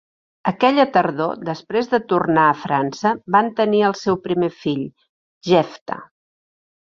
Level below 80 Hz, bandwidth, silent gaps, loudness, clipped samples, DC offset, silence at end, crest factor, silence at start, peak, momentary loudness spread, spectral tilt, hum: -62 dBFS; 7.4 kHz; 5.09-5.41 s, 5.81-5.86 s; -19 LUFS; under 0.1%; under 0.1%; 0.8 s; 18 dB; 0.45 s; -2 dBFS; 11 LU; -6.5 dB/octave; none